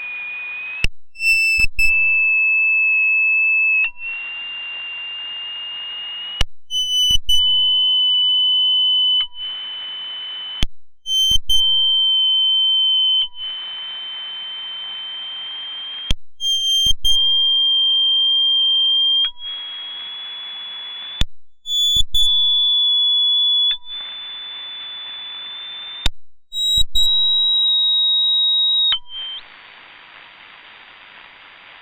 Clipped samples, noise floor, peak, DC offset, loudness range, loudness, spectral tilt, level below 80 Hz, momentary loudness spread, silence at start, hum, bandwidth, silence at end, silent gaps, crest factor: under 0.1%; -43 dBFS; -6 dBFS; under 0.1%; 7 LU; -15 LUFS; 1 dB/octave; -34 dBFS; 15 LU; 0 s; none; over 20 kHz; 0 s; none; 14 dB